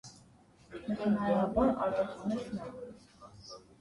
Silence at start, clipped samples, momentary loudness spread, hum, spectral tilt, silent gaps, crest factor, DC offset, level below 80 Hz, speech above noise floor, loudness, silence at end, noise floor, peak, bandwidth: 0.05 s; under 0.1%; 21 LU; none; -7 dB/octave; none; 18 dB; under 0.1%; -56 dBFS; 29 dB; -32 LUFS; 0.2 s; -61 dBFS; -16 dBFS; 11.5 kHz